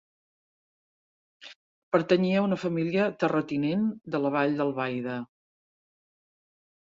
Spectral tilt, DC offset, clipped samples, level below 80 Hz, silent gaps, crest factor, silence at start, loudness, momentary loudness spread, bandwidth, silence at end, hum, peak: -7.5 dB/octave; under 0.1%; under 0.1%; -72 dBFS; 1.56-1.92 s; 20 dB; 1.4 s; -27 LUFS; 8 LU; 7.6 kHz; 1.6 s; none; -8 dBFS